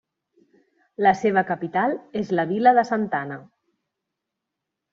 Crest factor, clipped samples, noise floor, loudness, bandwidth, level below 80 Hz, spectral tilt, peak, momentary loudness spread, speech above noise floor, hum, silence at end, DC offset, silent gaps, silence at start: 20 dB; under 0.1%; -83 dBFS; -22 LUFS; 7.4 kHz; -68 dBFS; -5 dB/octave; -4 dBFS; 13 LU; 62 dB; none; 1.5 s; under 0.1%; none; 1 s